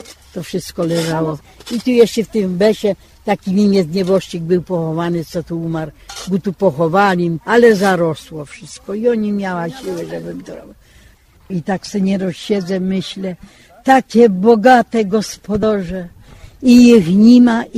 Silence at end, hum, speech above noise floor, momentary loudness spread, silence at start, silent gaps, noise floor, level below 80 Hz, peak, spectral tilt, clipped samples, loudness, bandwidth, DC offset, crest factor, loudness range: 0 s; none; 32 dB; 18 LU; 0.1 s; none; -47 dBFS; -46 dBFS; 0 dBFS; -6.5 dB/octave; under 0.1%; -14 LUFS; 14.5 kHz; under 0.1%; 14 dB; 10 LU